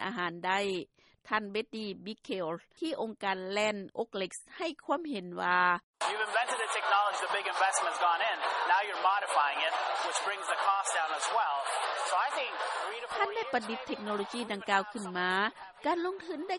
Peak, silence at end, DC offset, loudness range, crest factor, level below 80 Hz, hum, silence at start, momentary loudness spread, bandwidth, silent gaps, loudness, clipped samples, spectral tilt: -12 dBFS; 0 s; under 0.1%; 6 LU; 20 dB; -76 dBFS; none; 0 s; 10 LU; 11.5 kHz; 5.83-5.94 s; -32 LUFS; under 0.1%; -2.5 dB/octave